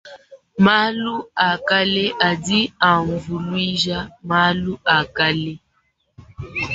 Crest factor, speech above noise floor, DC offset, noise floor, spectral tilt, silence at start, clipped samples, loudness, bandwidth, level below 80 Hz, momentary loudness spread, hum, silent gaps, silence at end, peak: 18 dB; 47 dB; under 0.1%; -66 dBFS; -5 dB/octave; 0.05 s; under 0.1%; -18 LUFS; 8 kHz; -48 dBFS; 10 LU; none; none; 0 s; -2 dBFS